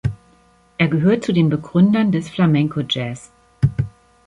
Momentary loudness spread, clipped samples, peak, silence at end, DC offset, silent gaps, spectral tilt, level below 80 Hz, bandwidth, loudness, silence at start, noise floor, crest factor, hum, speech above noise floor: 13 LU; under 0.1%; -4 dBFS; 0.4 s; under 0.1%; none; -7.5 dB/octave; -44 dBFS; 10.5 kHz; -18 LUFS; 0.05 s; -54 dBFS; 16 dB; none; 37 dB